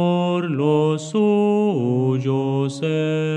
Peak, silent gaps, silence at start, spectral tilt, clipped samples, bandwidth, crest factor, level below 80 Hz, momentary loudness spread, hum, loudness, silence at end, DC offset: -6 dBFS; none; 0 s; -7.5 dB/octave; under 0.1%; 10 kHz; 12 dB; -70 dBFS; 5 LU; none; -20 LUFS; 0 s; under 0.1%